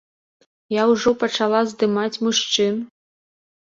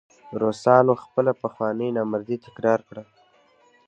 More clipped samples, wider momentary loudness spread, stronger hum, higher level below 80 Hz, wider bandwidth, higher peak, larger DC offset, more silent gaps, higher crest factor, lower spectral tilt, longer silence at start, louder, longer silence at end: neither; second, 7 LU vs 15 LU; neither; about the same, -62 dBFS vs -66 dBFS; second, 7.8 kHz vs 9.2 kHz; about the same, -4 dBFS vs -2 dBFS; neither; neither; about the same, 18 dB vs 22 dB; second, -3.5 dB/octave vs -7.5 dB/octave; first, 0.7 s vs 0.25 s; first, -20 LUFS vs -23 LUFS; about the same, 0.85 s vs 0.85 s